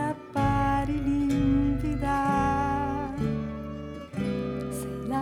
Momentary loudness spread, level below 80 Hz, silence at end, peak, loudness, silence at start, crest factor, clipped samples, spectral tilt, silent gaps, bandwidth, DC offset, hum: 9 LU; -38 dBFS; 0 s; -12 dBFS; -28 LUFS; 0 s; 14 dB; under 0.1%; -7.5 dB/octave; none; 15 kHz; under 0.1%; none